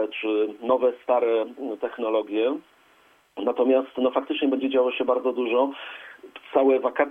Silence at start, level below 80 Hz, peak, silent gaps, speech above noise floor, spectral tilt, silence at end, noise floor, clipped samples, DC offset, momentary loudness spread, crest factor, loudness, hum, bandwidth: 0 s; -72 dBFS; -6 dBFS; none; 35 dB; -6 dB/octave; 0 s; -59 dBFS; under 0.1%; under 0.1%; 12 LU; 18 dB; -24 LUFS; none; 3.8 kHz